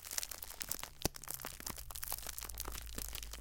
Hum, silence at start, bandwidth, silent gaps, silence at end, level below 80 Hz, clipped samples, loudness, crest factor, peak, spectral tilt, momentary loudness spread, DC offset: none; 0 s; 17 kHz; none; 0 s; -52 dBFS; under 0.1%; -43 LUFS; 32 dB; -12 dBFS; -2 dB/octave; 4 LU; under 0.1%